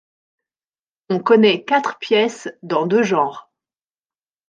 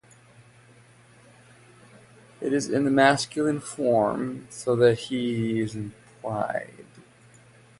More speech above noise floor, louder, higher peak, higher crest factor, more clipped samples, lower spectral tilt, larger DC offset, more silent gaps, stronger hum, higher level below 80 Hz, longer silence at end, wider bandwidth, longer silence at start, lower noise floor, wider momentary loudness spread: first, over 73 dB vs 30 dB; first, -17 LUFS vs -25 LUFS; first, -2 dBFS vs -6 dBFS; about the same, 18 dB vs 22 dB; neither; about the same, -5 dB/octave vs -5.5 dB/octave; neither; neither; neither; second, -70 dBFS vs -64 dBFS; first, 1.1 s vs 0.8 s; second, 9 kHz vs 11.5 kHz; second, 1.1 s vs 2.4 s; first, under -90 dBFS vs -54 dBFS; second, 10 LU vs 14 LU